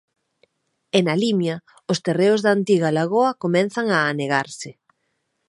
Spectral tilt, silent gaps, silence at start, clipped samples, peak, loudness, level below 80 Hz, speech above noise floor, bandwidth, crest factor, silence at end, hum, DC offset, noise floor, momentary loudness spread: -5.5 dB/octave; none; 0.95 s; under 0.1%; -2 dBFS; -20 LUFS; -70 dBFS; 53 dB; 11.5 kHz; 18 dB; 0.75 s; none; under 0.1%; -73 dBFS; 9 LU